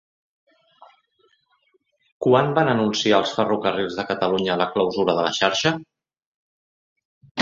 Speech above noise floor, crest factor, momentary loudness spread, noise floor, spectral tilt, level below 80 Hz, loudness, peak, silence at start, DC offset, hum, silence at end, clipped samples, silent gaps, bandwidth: 46 dB; 22 dB; 7 LU; -66 dBFS; -4.5 dB/octave; -62 dBFS; -21 LUFS; -2 dBFS; 2.2 s; under 0.1%; none; 0 s; under 0.1%; 6.26-6.96 s, 7.05-7.21 s, 7.31-7.35 s; 7.8 kHz